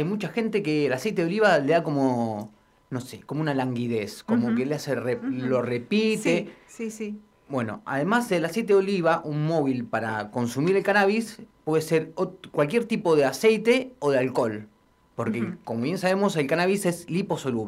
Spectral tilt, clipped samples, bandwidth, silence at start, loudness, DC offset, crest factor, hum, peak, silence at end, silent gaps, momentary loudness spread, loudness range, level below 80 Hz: -6 dB/octave; under 0.1%; 16 kHz; 0 s; -25 LUFS; under 0.1%; 18 dB; none; -8 dBFS; 0 s; none; 12 LU; 4 LU; -66 dBFS